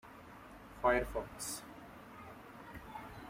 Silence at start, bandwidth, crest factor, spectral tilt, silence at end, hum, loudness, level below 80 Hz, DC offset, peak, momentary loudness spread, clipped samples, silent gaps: 0.05 s; 16 kHz; 22 dB; -3.5 dB/octave; 0 s; none; -38 LUFS; -56 dBFS; under 0.1%; -18 dBFS; 21 LU; under 0.1%; none